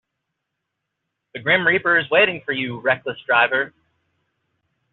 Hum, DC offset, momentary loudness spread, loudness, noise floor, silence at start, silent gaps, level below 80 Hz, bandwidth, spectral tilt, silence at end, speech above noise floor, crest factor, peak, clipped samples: none; under 0.1%; 10 LU; -18 LUFS; -79 dBFS; 1.35 s; none; -66 dBFS; 4.3 kHz; -1.5 dB/octave; 1.25 s; 60 dB; 18 dB; -4 dBFS; under 0.1%